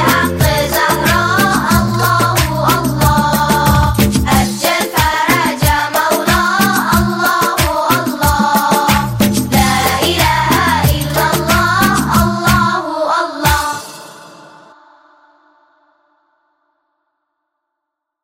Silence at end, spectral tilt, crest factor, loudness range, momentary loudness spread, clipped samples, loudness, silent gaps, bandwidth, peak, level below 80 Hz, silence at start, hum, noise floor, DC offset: 3.8 s; -4 dB/octave; 14 dB; 5 LU; 3 LU; under 0.1%; -12 LUFS; none; 16.5 kHz; 0 dBFS; -26 dBFS; 0 s; none; -77 dBFS; under 0.1%